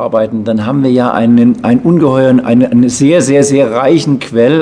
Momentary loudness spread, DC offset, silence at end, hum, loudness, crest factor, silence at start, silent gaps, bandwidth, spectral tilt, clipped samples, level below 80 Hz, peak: 5 LU; under 0.1%; 0 s; none; -9 LUFS; 8 dB; 0 s; none; 10 kHz; -6.5 dB/octave; 1%; -48 dBFS; 0 dBFS